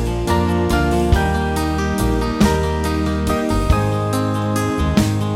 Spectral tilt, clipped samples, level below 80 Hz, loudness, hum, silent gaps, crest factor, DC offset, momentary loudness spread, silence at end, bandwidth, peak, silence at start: -6 dB/octave; under 0.1%; -24 dBFS; -18 LUFS; none; none; 16 dB; under 0.1%; 3 LU; 0 s; 16.5 kHz; 0 dBFS; 0 s